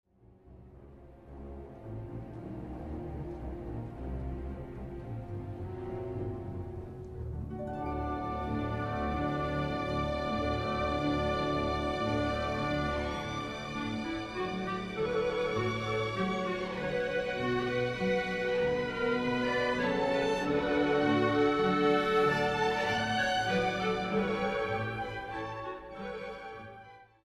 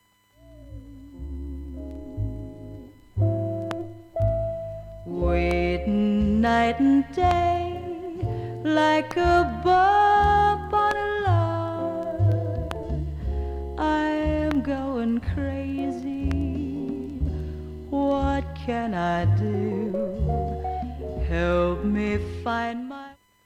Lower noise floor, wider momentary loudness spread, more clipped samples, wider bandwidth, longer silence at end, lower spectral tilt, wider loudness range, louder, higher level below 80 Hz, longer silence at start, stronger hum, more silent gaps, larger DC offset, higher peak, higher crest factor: about the same, -58 dBFS vs -55 dBFS; about the same, 15 LU vs 16 LU; neither; first, 13 kHz vs 10.5 kHz; about the same, 0.2 s vs 0.3 s; second, -6 dB/octave vs -7.5 dB/octave; first, 13 LU vs 8 LU; second, -32 LUFS vs -25 LUFS; second, -48 dBFS vs -34 dBFS; about the same, 0.45 s vs 0.45 s; neither; neither; neither; second, -16 dBFS vs -6 dBFS; about the same, 16 dB vs 18 dB